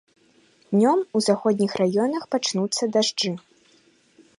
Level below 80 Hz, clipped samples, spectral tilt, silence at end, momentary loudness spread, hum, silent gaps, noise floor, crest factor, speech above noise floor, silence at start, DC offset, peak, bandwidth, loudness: -72 dBFS; under 0.1%; -4.5 dB/octave; 1 s; 5 LU; none; none; -59 dBFS; 18 dB; 37 dB; 0.7 s; under 0.1%; -6 dBFS; 11.5 kHz; -22 LUFS